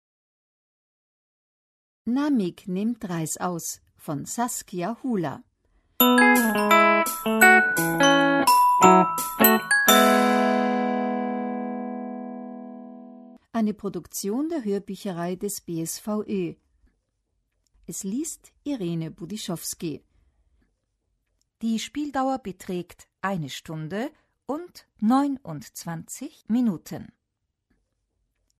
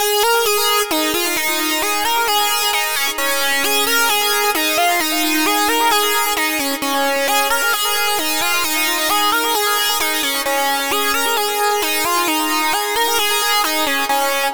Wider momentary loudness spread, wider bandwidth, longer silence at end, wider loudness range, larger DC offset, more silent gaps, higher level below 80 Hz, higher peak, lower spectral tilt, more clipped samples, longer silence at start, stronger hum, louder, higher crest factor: first, 19 LU vs 2 LU; second, 13.5 kHz vs over 20 kHz; first, 1.55 s vs 0 s; first, 15 LU vs 1 LU; neither; neither; second, -64 dBFS vs -52 dBFS; about the same, -2 dBFS vs -4 dBFS; first, -4 dB/octave vs 0.5 dB/octave; neither; first, 2.05 s vs 0 s; neither; second, -23 LUFS vs -15 LUFS; first, 22 dB vs 12 dB